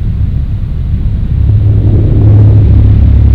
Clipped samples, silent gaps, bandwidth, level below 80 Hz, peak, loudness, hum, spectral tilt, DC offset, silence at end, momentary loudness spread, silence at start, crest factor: 5%; none; 3.9 kHz; -10 dBFS; 0 dBFS; -8 LUFS; none; -11.5 dB/octave; 4%; 0 s; 10 LU; 0 s; 6 dB